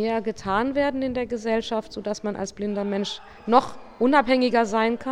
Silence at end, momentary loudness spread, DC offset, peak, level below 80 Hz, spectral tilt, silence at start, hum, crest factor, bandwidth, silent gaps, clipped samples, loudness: 0 s; 10 LU; under 0.1%; -2 dBFS; -52 dBFS; -5 dB/octave; 0 s; none; 22 dB; 10.5 kHz; none; under 0.1%; -24 LUFS